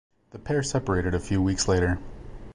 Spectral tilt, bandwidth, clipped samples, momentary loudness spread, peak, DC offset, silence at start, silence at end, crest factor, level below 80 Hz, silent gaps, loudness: -5 dB/octave; 10.5 kHz; under 0.1%; 19 LU; -12 dBFS; under 0.1%; 0.35 s; 0 s; 14 dB; -38 dBFS; none; -26 LUFS